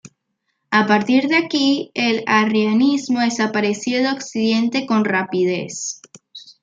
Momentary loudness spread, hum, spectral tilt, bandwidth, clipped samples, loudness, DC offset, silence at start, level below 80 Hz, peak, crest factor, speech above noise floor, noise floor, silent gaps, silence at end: 6 LU; none; -4 dB/octave; 9.2 kHz; under 0.1%; -18 LUFS; under 0.1%; 0.05 s; -66 dBFS; -2 dBFS; 18 dB; 55 dB; -73 dBFS; none; 0.1 s